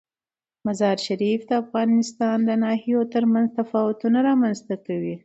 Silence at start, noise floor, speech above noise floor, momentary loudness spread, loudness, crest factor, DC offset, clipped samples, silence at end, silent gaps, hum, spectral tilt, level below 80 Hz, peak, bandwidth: 0.65 s; under -90 dBFS; over 69 dB; 8 LU; -22 LUFS; 14 dB; under 0.1%; under 0.1%; 0.05 s; none; none; -6 dB/octave; -70 dBFS; -8 dBFS; 8.2 kHz